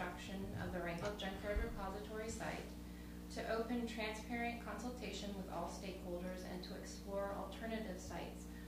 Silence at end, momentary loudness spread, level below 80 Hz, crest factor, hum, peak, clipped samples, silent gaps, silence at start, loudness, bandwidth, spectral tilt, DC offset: 0 s; 6 LU; -54 dBFS; 16 dB; 60 Hz at -55 dBFS; -28 dBFS; under 0.1%; none; 0 s; -46 LUFS; 15.5 kHz; -5 dB/octave; under 0.1%